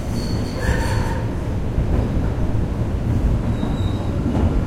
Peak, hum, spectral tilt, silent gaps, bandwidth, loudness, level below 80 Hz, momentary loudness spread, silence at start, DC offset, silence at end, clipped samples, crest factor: -4 dBFS; none; -7.5 dB/octave; none; 14.5 kHz; -22 LUFS; -24 dBFS; 3 LU; 0 s; under 0.1%; 0 s; under 0.1%; 14 dB